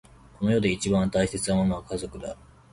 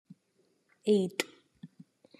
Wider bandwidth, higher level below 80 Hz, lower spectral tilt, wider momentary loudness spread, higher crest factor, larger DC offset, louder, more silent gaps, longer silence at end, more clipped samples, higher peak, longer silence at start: second, 11.5 kHz vs 13.5 kHz; first, -46 dBFS vs -86 dBFS; about the same, -5.5 dB/octave vs -5 dB/octave; second, 14 LU vs 25 LU; second, 16 dB vs 22 dB; neither; first, -26 LUFS vs -31 LUFS; neither; second, 0.4 s vs 0.55 s; neither; about the same, -10 dBFS vs -12 dBFS; second, 0.4 s vs 0.85 s